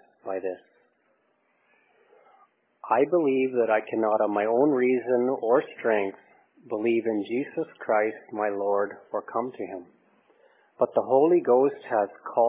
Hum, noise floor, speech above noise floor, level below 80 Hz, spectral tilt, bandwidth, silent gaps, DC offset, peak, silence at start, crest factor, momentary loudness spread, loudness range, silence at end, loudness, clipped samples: none; -69 dBFS; 45 dB; -82 dBFS; -10 dB/octave; 3.9 kHz; none; under 0.1%; -8 dBFS; 0.25 s; 18 dB; 12 LU; 6 LU; 0 s; -25 LUFS; under 0.1%